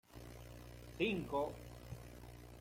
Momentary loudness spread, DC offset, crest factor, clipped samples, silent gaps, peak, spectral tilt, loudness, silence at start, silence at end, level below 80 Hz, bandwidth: 17 LU; under 0.1%; 22 dB; under 0.1%; none; -24 dBFS; -6 dB/octave; -42 LUFS; 0.1 s; 0 s; -60 dBFS; 16.5 kHz